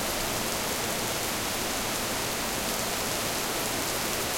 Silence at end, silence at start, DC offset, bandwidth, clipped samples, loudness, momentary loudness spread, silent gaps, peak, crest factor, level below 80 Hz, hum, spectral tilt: 0 s; 0 s; under 0.1%; 17 kHz; under 0.1%; -28 LUFS; 1 LU; none; -12 dBFS; 18 dB; -48 dBFS; none; -2 dB/octave